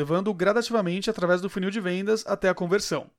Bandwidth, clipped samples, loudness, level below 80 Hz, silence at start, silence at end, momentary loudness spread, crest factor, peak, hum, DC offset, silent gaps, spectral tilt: 16 kHz; under 0.1%; -25 LUFS; -58 dBFS; 0 s; 0.1 s; 4 LU; 16 dB; -10 dBFS; none; under 0.1%; none; -5 dB/octave